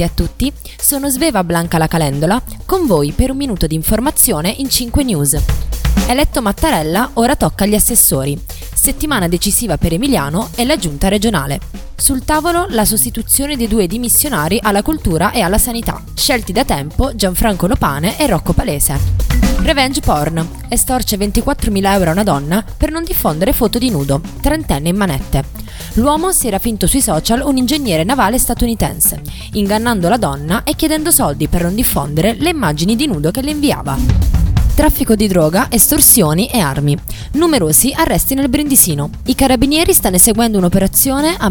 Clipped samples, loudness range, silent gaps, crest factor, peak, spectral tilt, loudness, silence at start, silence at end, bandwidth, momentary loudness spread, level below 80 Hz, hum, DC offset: under 0.1%; 4 LU; none; 14 dB; 0 dBFS; -4 dB/octave; -13 LUFS; 0 s; 0 s; 20 kHz; 8 LU; -22 dBFS; none; under 0.1%